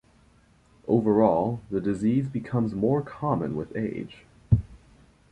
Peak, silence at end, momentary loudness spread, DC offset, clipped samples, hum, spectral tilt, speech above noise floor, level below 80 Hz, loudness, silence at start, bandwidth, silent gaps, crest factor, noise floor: -6 dBFS; 0.55 s; 10 LU; under 0.1%; under 0.1%; none; -10 dB/octave; 34 dB; -46 dBFS; -26 LUFS; 0.85 s; 8.8 kHz; none; 20 dB; -59 dBFS